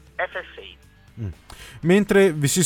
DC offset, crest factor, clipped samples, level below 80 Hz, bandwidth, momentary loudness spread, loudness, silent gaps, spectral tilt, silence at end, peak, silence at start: under 0.1%; 18 dB; under 0.1%; -48 dBFS; 19.5 kHz; 24 LU; -20 LUFS; none; -5 dB/octave; 0 s; -4 dBFS; 0.2 s